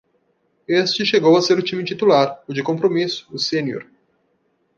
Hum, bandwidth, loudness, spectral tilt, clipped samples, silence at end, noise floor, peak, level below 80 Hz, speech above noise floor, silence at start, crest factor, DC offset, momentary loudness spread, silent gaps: none; 7.4 kHz; -18 LUFS; -5 dB/octave; under 0.1%; 0.95 s; -66 dBFS; -2 dBFS; -68 dBFS; 48 dB; 0.7 s; 18 dB; under 0.1%; 10 LU; none